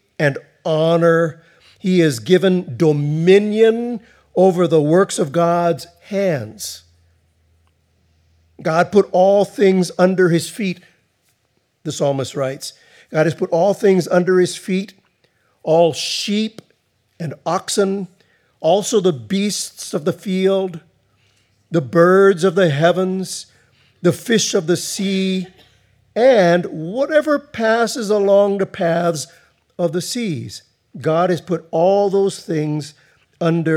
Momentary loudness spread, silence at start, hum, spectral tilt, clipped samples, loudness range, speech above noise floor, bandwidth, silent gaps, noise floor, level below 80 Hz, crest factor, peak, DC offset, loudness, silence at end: 13 LU; 0.2 s; none; -5.5 dB/octave; under 0.1%; 5 LU; 49 dB; 15.5 kHz; none; -65 dBFS; -68 dBFS; 18 dB; 0 dBFS; under 0.1%; -17 LUFS; 0 s